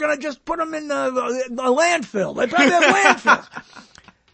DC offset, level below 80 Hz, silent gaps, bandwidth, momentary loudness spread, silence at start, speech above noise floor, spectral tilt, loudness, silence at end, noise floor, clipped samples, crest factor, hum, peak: under 0.1%; -58 dBFS; none; 8.8 kHz; 12 LU; 0 s; 31 dB; -3 dB/octave; -18 LUFS; 0.5 s; -50 dBFS; under 0.1%; 20 dB; none; 0 dBFS